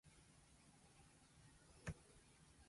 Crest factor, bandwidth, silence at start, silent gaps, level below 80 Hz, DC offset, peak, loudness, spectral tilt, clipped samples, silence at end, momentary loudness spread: 24 dB; 11.5 kHz; 0.05 s; none; -70 dBFS; under 0.1%; -38 dBFS; -63 LUFS; -4.5 dB/octave; under 0.1%; 0 s; 13 LU